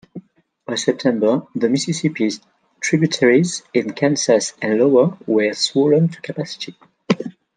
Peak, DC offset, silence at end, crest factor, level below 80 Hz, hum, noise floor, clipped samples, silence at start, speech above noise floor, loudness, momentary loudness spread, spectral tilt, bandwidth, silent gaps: -2 dBFS; under 0.1%; 0.25 s; 16 dB; -66 dBFS; none; -45 dBFS; under 0.1%; 0.15 s; 27 dB; -18 LUFS; 12 LU; -5 dB/octave; 10 kHz; none